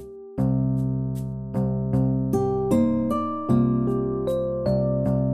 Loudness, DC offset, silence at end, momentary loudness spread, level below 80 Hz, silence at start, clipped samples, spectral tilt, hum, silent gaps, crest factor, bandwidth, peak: -24 LUFS; under 0.1%; 0 s; 6 LU; -42 dBFS; 0 s; under 0.1%; -10 dB/octave; none; none; 14 dB; 12 kHz; -10 dBFS